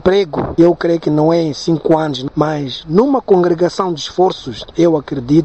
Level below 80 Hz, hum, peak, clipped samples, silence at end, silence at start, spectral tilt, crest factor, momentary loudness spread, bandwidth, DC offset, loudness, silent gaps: -42 dBFS; none; 0 dBFS; under 0.1%; 0 s; 0.05 s; -7 dB/octave; 14 dB; 7 LU; 8.4 kHz; 0.3%; -14 LUFS; none